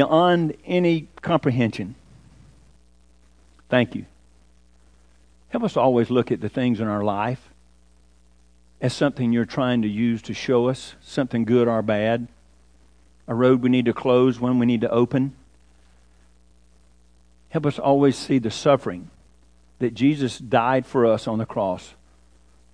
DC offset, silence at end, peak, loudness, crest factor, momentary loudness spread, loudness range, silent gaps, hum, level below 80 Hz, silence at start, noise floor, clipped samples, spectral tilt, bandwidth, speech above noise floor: 0.1%; 0.85 s; -2 dBFS; -22 LUFS; 20 dB; 10 LU; 5 LU; none; none; -56 dBFS; 0 s; -57 dBFS; under 0.1%; -7 dB/octave; 10.5 kHz; 36 dB